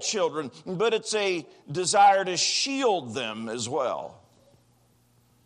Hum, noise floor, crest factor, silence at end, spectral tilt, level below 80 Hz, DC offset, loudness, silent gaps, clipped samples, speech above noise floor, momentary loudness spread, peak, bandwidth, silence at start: none; -63 dBFS; 18 dB; 1.35 s; -2.5 dB/octave; -76 dBFS; under 0.1%; -25 LUFS; none; under 0.1%; 38 dB; 15 LU; -8 dBFS; 11 kHz; 0 s